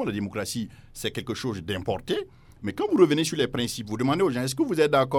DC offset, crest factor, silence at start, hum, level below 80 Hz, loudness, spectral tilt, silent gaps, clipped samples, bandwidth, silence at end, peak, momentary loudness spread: under 0.1%; 20 dB; 0 s; none; -54 dBFS; -26 LUFS; -5 dB/octave; none; under 0.1%; 17.5 kHz; 0 s; -6 dBFS; 12 LU